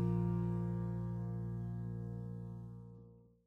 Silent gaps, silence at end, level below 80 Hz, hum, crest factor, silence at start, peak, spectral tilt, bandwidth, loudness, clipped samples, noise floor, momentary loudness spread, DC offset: none; 0.25 s; -56 dBFS; none; 12 dB; 0 s; -28 dBFS; -11.5 dB/octave; 2.9 kHz; -41 LUFS; under 0.1%; -60 dBFS; 16 LU; under 0.1%